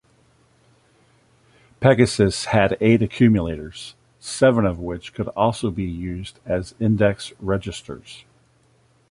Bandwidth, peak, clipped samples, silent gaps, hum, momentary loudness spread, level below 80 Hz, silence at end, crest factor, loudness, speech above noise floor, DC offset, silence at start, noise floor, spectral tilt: 11.5 kHz; -2 dBFS; under 0.1%; none; none; 18 LU; -44 dBFS; 0.9 s; 20 dB; -20 LUFS; 39 dB; under 0.1%; 1.8 s; -59 dBFS; -6 dB/octave